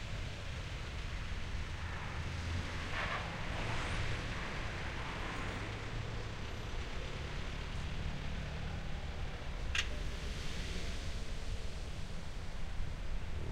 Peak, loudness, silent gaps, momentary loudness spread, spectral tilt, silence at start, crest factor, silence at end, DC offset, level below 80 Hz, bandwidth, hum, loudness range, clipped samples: -20 dBFS; -42 LUFS; none; 6 LU; -4.5 dB/octave; 0 s; 20 dB; 0 s; under 0.1%; -44 dBFS; 12.5 kHz; none; 3 LU; under 0.1%